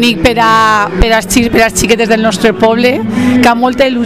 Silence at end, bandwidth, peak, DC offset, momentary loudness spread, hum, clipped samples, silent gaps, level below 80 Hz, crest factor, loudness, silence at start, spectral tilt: 0 s; 16 kHz; 0 dBFS; 1%; 3 LU; none; 0.8%; none; -22 dBFS; 8 dB; -9 LUFS; 0 s; -4 dB/octave